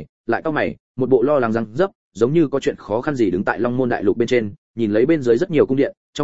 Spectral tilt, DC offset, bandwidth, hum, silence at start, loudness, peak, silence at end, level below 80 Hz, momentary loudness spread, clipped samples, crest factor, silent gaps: -7 dB/octave; 0.9%; 8 kHz; none; 0 s; -19 LUFS; -2 dBFS; 0 s; -52 dBFS; 7 LU; under 0.1%; 16 dB; 0.09-0.24 s, 0.80-0.94 s, 1.95-2.11 s, 4.58-4.74 s, 5.97-6.13 s